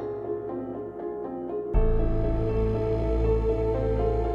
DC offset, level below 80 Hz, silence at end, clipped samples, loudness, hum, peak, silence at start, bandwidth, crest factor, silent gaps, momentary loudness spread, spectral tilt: under 0.1%; -28 dBFS; 0 s; under 0.1%; -28 LUFS; none; -10 dBFS; 0 s; 5.2 kHz; 16 dB; none; 9 LU; -10 dB/octave